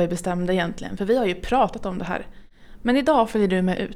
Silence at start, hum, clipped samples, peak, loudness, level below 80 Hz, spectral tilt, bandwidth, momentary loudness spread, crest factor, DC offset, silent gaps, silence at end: 0 s; none; under 0.1%; -6 dBFS; -23 LUFS; -42 dBFS; -6 dB/octave; 14.5 kHz; 10 LU; 16 dB; under 0.1%; none; 0 s